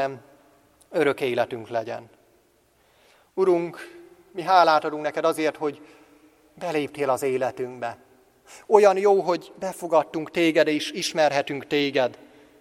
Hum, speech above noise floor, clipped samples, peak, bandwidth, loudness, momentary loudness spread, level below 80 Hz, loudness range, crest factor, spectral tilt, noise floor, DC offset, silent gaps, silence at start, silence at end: none; 39 dB; under 0.1%; 0 dBFS; 15 kHz; -23 LUFS; 16 LU; -70 dBFS; 7 LU; 24 dB; -4.5 dB/octave; -62 dBFS; under 0.1%; none; 0 s; 0.45 s